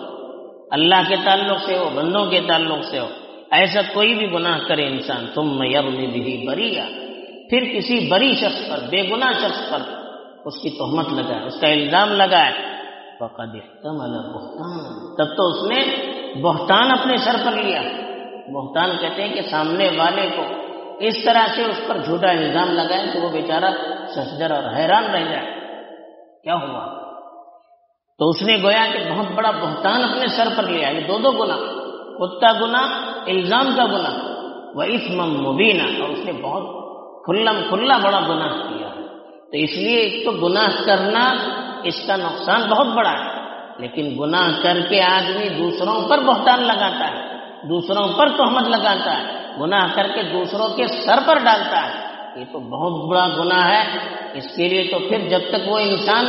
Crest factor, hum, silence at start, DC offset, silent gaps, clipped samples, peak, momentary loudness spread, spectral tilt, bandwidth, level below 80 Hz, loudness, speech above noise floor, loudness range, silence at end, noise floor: 20 dB; none; 0 s; under 0.1%; none; under 0.1%; 0 dBFS; 16 LU; -1.5 dB/octave; 6 kHz; -68 dBFS; -18 LUFS; 39 dB; 4 LU; 0 s; -58 dBFS